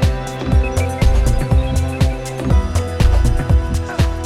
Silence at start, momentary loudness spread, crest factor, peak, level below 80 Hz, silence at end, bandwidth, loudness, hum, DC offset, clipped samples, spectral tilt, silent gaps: 0 s; 4 LU; 14 dB; -2 dBFS; -16 dBFS; 0 s; 14 kHz; -17 LUFS; none; under 0.1%; under 0.1%; -6.5 dB/octave; none